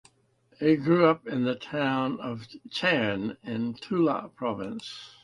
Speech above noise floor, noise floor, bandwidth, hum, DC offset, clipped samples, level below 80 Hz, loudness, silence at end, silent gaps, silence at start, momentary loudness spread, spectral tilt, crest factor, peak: 38 dB; -65 dBFS; 11 kHz; none; under 0.1%; under 0.1%; -66 dBFS; -27 LUFS; 0.15 s; none; 0.6 s; 14 LU; -7 dB/octave; 18 dB; -8 dBFS